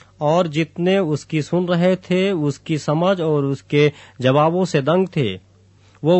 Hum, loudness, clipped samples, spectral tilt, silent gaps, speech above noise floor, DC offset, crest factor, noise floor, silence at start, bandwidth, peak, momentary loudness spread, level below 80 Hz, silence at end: none; -19 LUFS; under 0.1%; -7 dB/octave; none; 33 dB; under 0.1%; 16 dB; -51 dBFS; 0.2 s; 8.4 kHz; -2 dBFS; 6 LU; -60 dBFS; 0 s